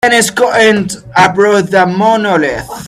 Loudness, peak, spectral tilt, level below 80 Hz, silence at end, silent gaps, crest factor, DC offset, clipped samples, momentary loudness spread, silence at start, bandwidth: -10 LUFS; 0 dBFS; -4 dB/octave; -44 dBFS; 0 s; none; 10 dB; under 0.1%; 0.1%; 6 LU; 0.05 s; 15 kHz